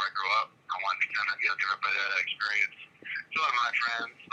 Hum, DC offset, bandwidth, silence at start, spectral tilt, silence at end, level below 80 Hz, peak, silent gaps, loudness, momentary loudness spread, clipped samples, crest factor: none; under 0.1%; 9 kHz; 0 s; 0 dB/octave; 0.05 s; -86 dBFS; -14 dBFS; none; -29 LUFS; 8 LU; under 0.1%; 16 dB